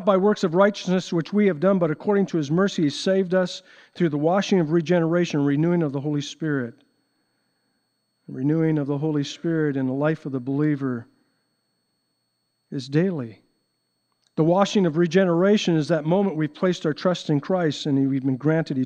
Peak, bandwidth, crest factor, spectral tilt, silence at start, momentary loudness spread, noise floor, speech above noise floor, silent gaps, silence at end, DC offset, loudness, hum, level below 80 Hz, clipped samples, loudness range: -4 dBFS; 9 kHz; 18 dB; -7 dB/octave; 0 s; 8 LU; -74 dBFS; 52 dB; none; 0 s; under 0.1%; -22 LUFS; none; -72 dBFS; under 0.1%; 7 LU